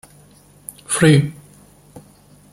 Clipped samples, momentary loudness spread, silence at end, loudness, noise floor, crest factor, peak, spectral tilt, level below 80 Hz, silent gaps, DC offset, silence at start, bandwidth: under 0.1%; 24 LU; 0.55 s; -16 LUFS; -49 dBFS; 20 dB; -2 dBFS; -5.5 dB/octave; -52 dBFS; none; under 0.1%; 0.9 s; 15.5 kHz